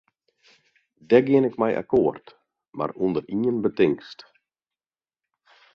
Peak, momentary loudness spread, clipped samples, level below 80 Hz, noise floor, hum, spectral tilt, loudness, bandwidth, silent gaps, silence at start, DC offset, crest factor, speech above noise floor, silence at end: -4 dBFS; 13 LU; under 0.1%; -62 dBFS; under -90 dBFS; none; -8.5 dB/octave; -23 LUFS; 6.4 kHz; none; 1.1 s; under 0.1%; 22 dB; over 68 dB; 1.6 s